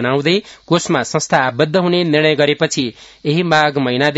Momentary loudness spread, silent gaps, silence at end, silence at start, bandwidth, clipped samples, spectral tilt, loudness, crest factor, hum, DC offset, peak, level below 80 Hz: 6 LU; none; 0 s; 0 s; 8 kHz; under 0.1%; -4.5 dB/octave; -15 LUFS; 16 dB; none; under 0.1%; 0 dBFS; -56 dBFS